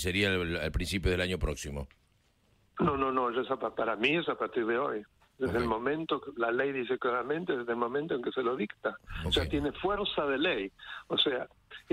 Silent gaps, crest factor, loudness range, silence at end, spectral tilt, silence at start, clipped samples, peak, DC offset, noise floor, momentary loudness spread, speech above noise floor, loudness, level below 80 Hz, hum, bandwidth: none; 18 dB; 1 LU; 0.1 s; -5 dB/octave; 0 s; under 0.1%; -14 dBFS; under 0.1%; -69 dBFS; 9 LU; 38 dB; -31 LUFS; -46 dBFS; none; 16 kHz